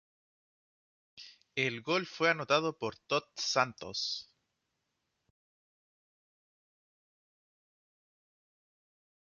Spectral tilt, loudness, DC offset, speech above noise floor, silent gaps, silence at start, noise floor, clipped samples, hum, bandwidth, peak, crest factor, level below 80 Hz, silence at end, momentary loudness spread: -1.5 dB/octave; -33 LUFS; under 0.1%; 51 dB; none; 1.15 s; -84 dBFS; under 0.1%; none; 7.2 kHz; -12 dBFS; 26 dB; -78 dBFS; 5 s; 11 LU